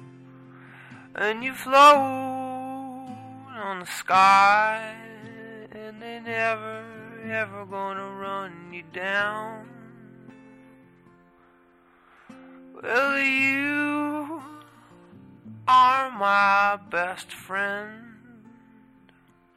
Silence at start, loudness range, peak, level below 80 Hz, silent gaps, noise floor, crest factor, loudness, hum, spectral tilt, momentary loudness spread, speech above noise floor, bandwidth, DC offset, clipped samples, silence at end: 0 s; 10 LU; -4 dBFS; -68 dBFS; none; -58 dBFS; 22 dB; -22 LUFS; none; -3.5 dB/octave; 24 LU; 36 dB; 16 kHz; under 0.1%; under 0.1%; 1.45 s